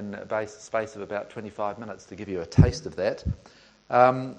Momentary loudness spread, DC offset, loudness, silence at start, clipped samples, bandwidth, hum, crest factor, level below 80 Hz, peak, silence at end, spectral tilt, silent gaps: 18 LU; under 0.1%; -26 LUFS; 0 s; under 0.1%; 9 kHz; none; 22 dB; -40 dBFS; -4 dBFS; 0 s; -7 dB/octave; none